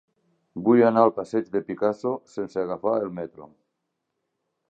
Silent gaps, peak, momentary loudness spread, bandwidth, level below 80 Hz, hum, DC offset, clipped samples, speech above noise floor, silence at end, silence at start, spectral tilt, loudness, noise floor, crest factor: none; -4 dBFS; 14 LU; 8 kHz; -68 dBFS; none; under 0.1%; under 0.1%; 56 dB; 1.25 s; 0.55 s; -8 dB/octave; -24 LUFS; -80 dBFS; 22 dB